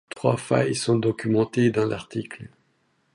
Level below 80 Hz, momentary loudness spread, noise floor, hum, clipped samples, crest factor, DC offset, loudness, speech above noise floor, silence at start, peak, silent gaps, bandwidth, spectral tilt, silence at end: -60 dBFS; 11 LU; -68 dBFS; none; under 0.1%; 18 dB; under 0.1%; -24 LUFS; 45 dB; 0.15 s; -6 dBFS; none; 11.5 kHz; -6 dB/octave; 0.65 s